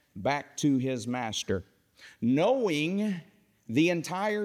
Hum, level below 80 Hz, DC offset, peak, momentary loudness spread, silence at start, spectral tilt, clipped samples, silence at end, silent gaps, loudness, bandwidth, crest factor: none; -68 dBFS; under 0.1%; -14 dBFS; 8 LU; 0.15 s; -5 dB/octave; under 0.1%; 0 s; none; -29 LUFS; 15.5 kHz; 16 dB